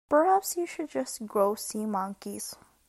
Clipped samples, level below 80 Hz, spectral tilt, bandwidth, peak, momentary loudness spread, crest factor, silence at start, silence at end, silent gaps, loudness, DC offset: under 0.1%; -70 dBFS; -4 dB/octave; 15.5 kHz; -12 dBFS; 14 LU; 18 dB; 0.1 s; 0.35 s; none; -29 LUFS; under 0.1%